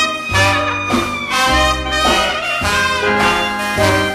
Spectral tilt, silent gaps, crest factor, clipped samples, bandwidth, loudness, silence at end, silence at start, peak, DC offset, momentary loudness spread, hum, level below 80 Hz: -3.5 dB/octave; none; 14 dB; under 0.1%; 15.5 kHz; -14 LUFS; 0 s; 0 s; 0 dBFS; under 0.1%; 4 LU; none; -30 dBFS